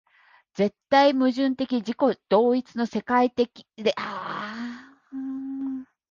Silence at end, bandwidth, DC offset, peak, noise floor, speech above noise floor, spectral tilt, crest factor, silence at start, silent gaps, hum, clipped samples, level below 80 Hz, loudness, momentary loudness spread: 0.25 s; 7.2 kHz; under 0.1%; -6 dBFS; -59 dBFS; 36 dB; -6 dB/octave; 20 dB; 0.55 s; none; none; under 0.1%; -68 dBFS; -25 LUFS; 16 LU